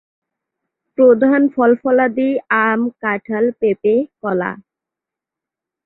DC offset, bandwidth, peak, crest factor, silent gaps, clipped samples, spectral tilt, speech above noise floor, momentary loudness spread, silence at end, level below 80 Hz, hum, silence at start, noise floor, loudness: under 0.1%; 4 kHz; -2 dBFS; 16 dB; none; under 0.1%; -10 dB/octave; 71 dB; 9 LU; 1.25 s; -62 dBFS; none; 1 s; -86 dBFS; -16 LUFS